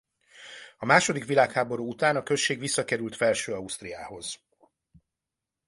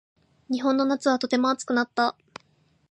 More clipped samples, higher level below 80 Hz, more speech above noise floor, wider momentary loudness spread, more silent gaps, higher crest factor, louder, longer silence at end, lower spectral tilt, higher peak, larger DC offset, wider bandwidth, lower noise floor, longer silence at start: neither; first, -66 dBFS vs -76 dBFS; first, 61 dB vs 40 dB; first, 17 LU vs 5 LU; neither; first, 22 dB vs 16 dB; about the same, -26 LUFS vs -24 LUFS; first, 1.3 s vs 0.8 s; about the same, -3.5 dB/octave vs -3.5 dB/octave; first, -6 dBFS vs -10 dBFS; neither; about the same, 11.5 kHz vs 10.5 kHz; first, -88 dBFS vs -64 dBFS; second, 0.35 s vs 0.5 s